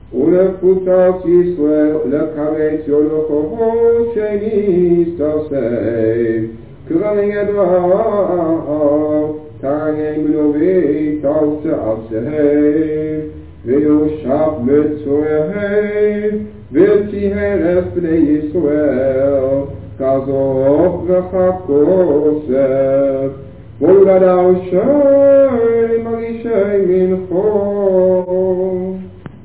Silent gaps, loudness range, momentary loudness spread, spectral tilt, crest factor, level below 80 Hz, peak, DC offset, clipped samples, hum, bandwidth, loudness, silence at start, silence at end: none; 4 LU; 8 LU; -12.5 dB/octave; 14 dB; -40 dBFS; 0 dBFS; 0.6%; under 0.1%; none; 4 kHz; -14 LUFS; 0.1 s; 0 s